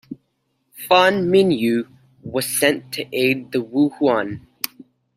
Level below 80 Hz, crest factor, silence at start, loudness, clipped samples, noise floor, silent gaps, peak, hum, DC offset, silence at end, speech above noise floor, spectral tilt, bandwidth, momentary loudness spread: -62 dBFS; 20 dB; 0.1 s; -19 LUFS; under 0.1%; -70 dBFS; none; 0 dBFS; none; under 0.1%; 0.35 s; 51 dB; -4 dB/octave; 16 kHz; 19 LU